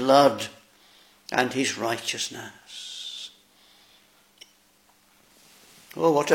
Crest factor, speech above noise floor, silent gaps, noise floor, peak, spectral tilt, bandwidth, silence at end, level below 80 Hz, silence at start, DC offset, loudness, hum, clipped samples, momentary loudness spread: 24 dB; 38 dB; none; -61 dBFS; -4 dBFS; -3.5 dB/octave; 16.5 kHz; 0 s; -74 dBFS; 0 s; under 0.1%; -25 LUFS; none; under 0.1%; 19 LU